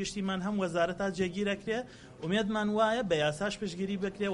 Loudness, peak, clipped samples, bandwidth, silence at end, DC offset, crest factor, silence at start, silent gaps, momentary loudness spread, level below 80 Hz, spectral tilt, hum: -32 LUFS; -14 dBFS; under 0.1%; 11.5 kHz; 0 s; under 0.1%; 18 dB; 0 s; none; 7 LU; -58 dBFS; -5 dB/octave; none